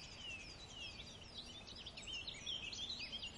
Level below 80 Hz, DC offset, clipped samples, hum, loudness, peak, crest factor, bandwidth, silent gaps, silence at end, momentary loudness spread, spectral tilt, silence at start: -64 dBFS; under 0.1%; under 0.1%; none; -47 LUFS; -34 dBFS; 16 dB; 11.5 kHz; none; 0 s; 8 LU; -1.5 dB/octave; 0 s